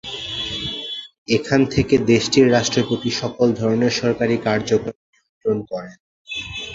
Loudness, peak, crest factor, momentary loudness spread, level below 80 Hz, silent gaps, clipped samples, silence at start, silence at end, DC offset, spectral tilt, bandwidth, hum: -19 LUFS; -2 dBFS; 18 dB; 14 LU; -46 dBFS; 1.18-1.26 s, 4.95-5.13 s, 5.29-5.41 s, 6.00-6.25 s; under 0.1%; 0.05 s; 0 s; under 0.1%; -5 dB/octave; 7.8 kHz; none